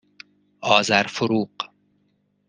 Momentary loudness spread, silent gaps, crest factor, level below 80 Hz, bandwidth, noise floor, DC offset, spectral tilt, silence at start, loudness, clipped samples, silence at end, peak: 16 LU; none; 24 dB; -68 dBFS; 10 kHz; -67 dBFS; under 0.1%; -3.5 dB/octave; 0.6 s; -20 LUFS; under 0.1%; 0.8 s; 0 dBFS